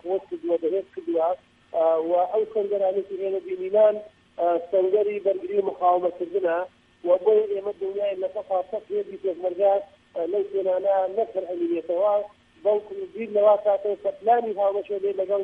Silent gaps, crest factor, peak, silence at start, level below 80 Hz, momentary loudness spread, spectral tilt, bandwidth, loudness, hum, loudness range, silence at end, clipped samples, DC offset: none; 16 dB; -8 dBFS; 0.05 s; -70 dBFS; 9 LU; -7.5 dB/octave; 4 kHz; -24 LUFS; none; 2 LU; 0 s; under 0.1%; under 0.1%